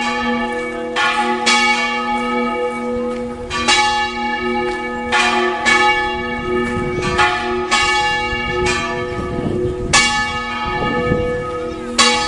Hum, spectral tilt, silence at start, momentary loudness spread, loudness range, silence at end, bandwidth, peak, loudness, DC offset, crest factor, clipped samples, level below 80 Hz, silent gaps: none; -3 dB/octave; 0 s; 9 LU; 2 LU; 0 s; 11.5 kHz; 0 dBFS; -17 LUFS; under 0.1%; 18 dB; under 0.1%; -36 dBFS; none